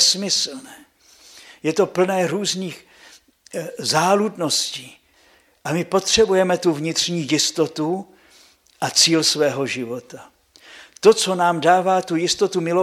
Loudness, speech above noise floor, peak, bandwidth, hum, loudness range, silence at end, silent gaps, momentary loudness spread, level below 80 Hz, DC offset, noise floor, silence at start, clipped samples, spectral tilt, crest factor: -19 LUFS; 36 dB; 0 dBFS; 15.5 kHz; none; 4 LU; 0 s; none; 14 LU; -56 dBFS; under 0.1%; -56 dBFS; 0 s; under 0.1%; -3 dB/octave; 20 dB